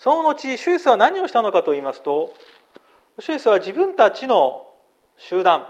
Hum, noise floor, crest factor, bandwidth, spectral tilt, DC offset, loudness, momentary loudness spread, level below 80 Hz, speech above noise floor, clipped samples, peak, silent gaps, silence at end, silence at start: none; -56 dBFS; 18 dB; 9.2 kHz; -4 dB/octave; under 0.1%; -19 LUFS; 10 LU; -72 dBFS; 37 dB; under 0.1%; 0 dBFS; none; 0 s; 0.05 s